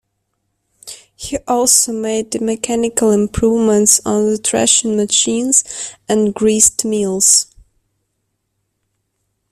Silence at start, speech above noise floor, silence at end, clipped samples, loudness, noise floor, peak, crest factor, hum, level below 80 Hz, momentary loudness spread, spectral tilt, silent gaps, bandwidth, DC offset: 0.85 s; 56 dB; 2.1 s; under 0.1%; -13 LUFS; -70 dBFS; 0 dBFS; 16 dB; none; -44 dBFS; 15 LU; -2.5 dB/octave; none; 19.5 kHz; under 0.1%